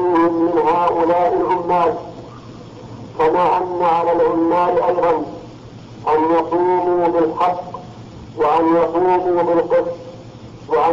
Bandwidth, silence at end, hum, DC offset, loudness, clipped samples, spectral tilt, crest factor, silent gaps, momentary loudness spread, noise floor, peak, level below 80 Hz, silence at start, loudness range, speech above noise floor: 7.4 kHz; 0 s; none; under 0.1%; -16 LUFS; under 0.1%; -7.5 dB/octave; 10 dB; none; 21 LU; -36 dBFS; -8 dBFS; -50 dBFS; 0 s; 1 LU; 21 dB